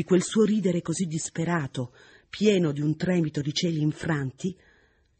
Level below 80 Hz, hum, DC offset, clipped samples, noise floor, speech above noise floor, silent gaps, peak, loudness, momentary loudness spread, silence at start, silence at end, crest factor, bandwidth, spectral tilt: -60 dBFS; none; under 0.1%; under 0.1%; -63 dBFS; 37 dB; none; -10 dBFS; -26 LUFS; 12 LU; 0 s; 0.65 s; 16 dB; 8.8 kHz; -5.5 dB/octave